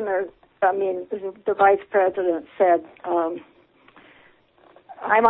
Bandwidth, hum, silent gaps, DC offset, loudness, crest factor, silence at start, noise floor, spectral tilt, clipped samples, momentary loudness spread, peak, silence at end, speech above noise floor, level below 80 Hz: 4 kHz; none; none; under 0.1%; -22 LUFS; 20 dB; 0 s; -55 dBFS; -9.5 dB/octave; under 0.1%; 12 LU; -4 dBFS; 0 s; 34 dB; -66 dBFS